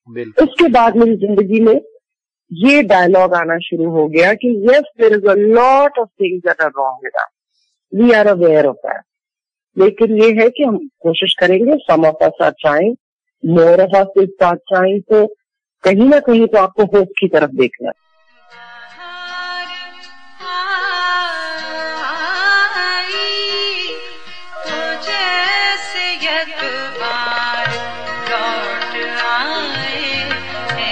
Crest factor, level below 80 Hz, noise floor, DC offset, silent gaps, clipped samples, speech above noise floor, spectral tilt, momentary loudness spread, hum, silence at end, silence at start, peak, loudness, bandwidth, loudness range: 12 dB; -52 dBFS; -89 dBFS; under 0.1%; 13.00-13.19 s; under 0.1%; 78 dB; -5.5 dB/octave; 14 LU; none; 0 s; 0.1 s; -2 dBFS; -14 LUFS; 9.6 kHz; 7 LU